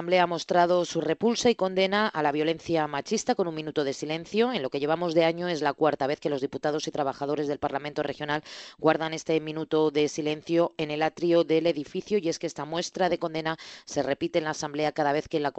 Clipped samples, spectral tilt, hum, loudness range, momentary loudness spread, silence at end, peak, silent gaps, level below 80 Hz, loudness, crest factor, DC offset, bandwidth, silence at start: under 0.1%; -4.5 dB/octave; none; 3 LU; 7 LU; 0.05 s; -6 dBFS; none; -64 dBFS; -27 LUFS; 20 dB; under 0.1%; 8.4 kHz; 0 s